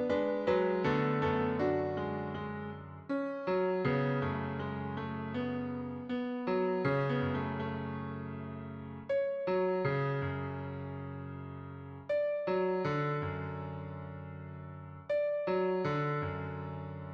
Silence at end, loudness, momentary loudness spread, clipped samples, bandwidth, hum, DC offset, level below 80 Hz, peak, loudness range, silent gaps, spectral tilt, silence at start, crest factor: 0 s; -35 LUFS; 13 LU; under 0.1%; 6.6 kHz; none; under 0.1%; -64 dBFS; -18 dBFS; 2 LU; none; -9 dB/octave; 0 s; 16 dB